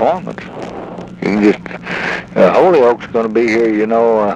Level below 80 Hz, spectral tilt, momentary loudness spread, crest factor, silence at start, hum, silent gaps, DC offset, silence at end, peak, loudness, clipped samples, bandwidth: -48 dBFS; -7 dB/octave; 17 LU; 12 dB; 0 s; none; none; under 0.1%; 0 s; 0 dBFS; -13 LUFS; under 0.1%; 9 kHz